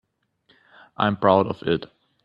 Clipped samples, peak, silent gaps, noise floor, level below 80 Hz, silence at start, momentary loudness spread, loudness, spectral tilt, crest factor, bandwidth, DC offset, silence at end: under 0.1%; -2 dBFS; none; -64 dBFS; -58 dBFS; 1 s; 7 LU; -22 LUFS; -9 dB/octave; 22 dB; 5.4 kHz; under 0.1%; 0.4 s